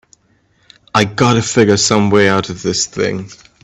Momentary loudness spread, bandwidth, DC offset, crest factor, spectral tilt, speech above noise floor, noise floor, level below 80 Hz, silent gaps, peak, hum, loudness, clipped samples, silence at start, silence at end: 8 LU; 10 kHz; under 0.1%; 14 dB; -4 dB/octave; 43 dB; -57 dBFS; -48 dBFS; none; 0 dBFS; none; -13 LUFS; under 0.1%; 0.95 s; 0.3 s